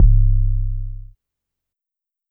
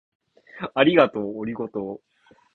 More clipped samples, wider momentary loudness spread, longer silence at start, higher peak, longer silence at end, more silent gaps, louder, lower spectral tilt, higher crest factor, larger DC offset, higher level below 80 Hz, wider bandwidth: neither; about the same, 18 LU vs 18 LU; second, 0 s vs 0.55 s; about the same, -2 dBFS vs -2 dBFS; first, 1.25 s vs 0.55 s; neither; about the same, -21 LUFS vs -22 LUFS; first, -14 dB/octave vs -8 dB/octave; second, 16 dB vs 22 dB; neither; first, -18 dBFS vs -64 dBFS; second, 0.3 kHz vs 4.4 kHz